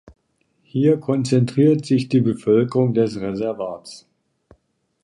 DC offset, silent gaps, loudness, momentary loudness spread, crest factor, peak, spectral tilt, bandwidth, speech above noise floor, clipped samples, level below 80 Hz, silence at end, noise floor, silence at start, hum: under 0.1%; none; -19 LUFS; 12 LU; 16 dB; -4 dBFS; -8 dB/octave; 11 kHz; 48 dB; under 0.1%; -58 dBFS; 1.05 s; -66 dBFS; 0.05 s; none